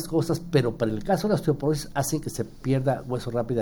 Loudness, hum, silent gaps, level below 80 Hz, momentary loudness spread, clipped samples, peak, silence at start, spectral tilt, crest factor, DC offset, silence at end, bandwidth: -26 LUFS; none; none; -46 dBFS; 5 LU; under 0.1%; -8 dBFS; 0 s; -6 dB/octave; 18 dB; under 0.1%; 0 s; over 20 kHz